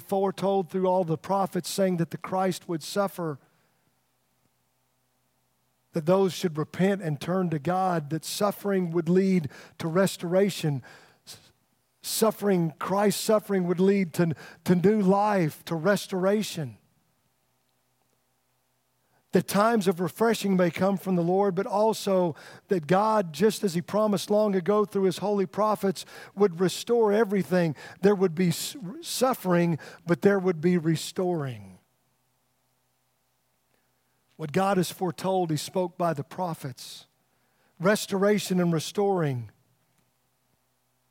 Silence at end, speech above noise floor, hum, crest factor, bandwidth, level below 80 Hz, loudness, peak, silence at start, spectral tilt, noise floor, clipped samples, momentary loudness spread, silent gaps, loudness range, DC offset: 1.65 s; 47 dB; none; 20 dB; 16.5 kHz; -74 dBFS; -26 LUFS; -6 dBFS; 0 s; -6 dB/octave; -73 dBFS; under 0.1%; 9 LU; none; 7 LU; under 0.1%